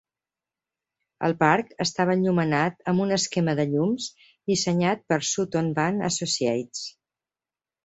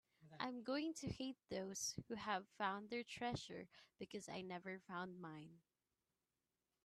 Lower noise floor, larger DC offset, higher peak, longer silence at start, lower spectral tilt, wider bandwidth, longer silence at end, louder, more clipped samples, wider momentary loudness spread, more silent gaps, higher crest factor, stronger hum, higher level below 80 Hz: about the same, under -90 dBFS vs under -90 dBFS; neither; first, -4 dBFS vs -28 dBFS; first, 1.2 s vs 0.2 s; about the same, -4.5 dB/octave vs -3.5 dB/octave; second, 8.2 kHz vs 13 kHz; second, 0.95 s vs 1.25 s; first, -24 LUFS vs -48 LUFS; neither; second, 8 LU vs 12 LU; neither; about the same, 22 dB vs 22 dB; neither; first, -64 dBFS vs -76 dBFS